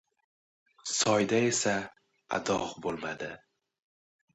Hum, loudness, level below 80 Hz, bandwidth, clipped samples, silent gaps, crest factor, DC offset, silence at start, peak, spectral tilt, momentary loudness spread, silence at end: none; -30 LUFS; -66 dBFS; 11 kHz; under 0.1%; none; 18 dB; under 0.1%; 0.85 s; -14 dBFS; -3 dB/octave; 16 LU; 0.95 s